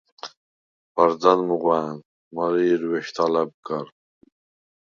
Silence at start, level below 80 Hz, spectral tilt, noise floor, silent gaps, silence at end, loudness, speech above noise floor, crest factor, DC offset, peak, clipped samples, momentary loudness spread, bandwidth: 0.25 s; -72 dBFS; -6 dB/octave; under -90 dBFS; 0.37-0.95 s, 2.05-2.31 s, 3.54-3.63 s; 1 s; -22 LUFS; over 69 dB; 22 dB; under 0.1%; -2 dBFS; under 0.1%; 21 LU; 7.2 kHz